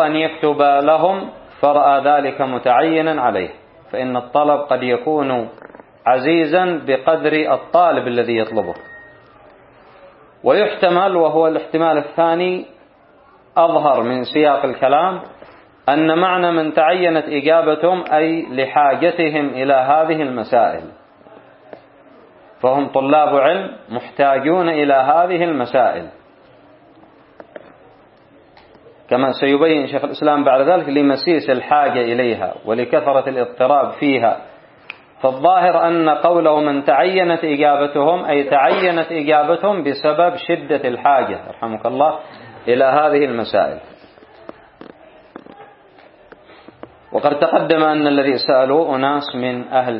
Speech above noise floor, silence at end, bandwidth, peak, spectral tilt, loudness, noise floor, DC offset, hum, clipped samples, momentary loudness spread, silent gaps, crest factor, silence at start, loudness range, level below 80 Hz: 34 dB; 0 s; 5.6 kHz; 0 dBFS; -10 dB/octave; -16 LUFS; -49 dBFS; under 0.1%; none; under 0.1%; 8 LU; none; 16 dB; 0 s; 5 LU; -62 dBFS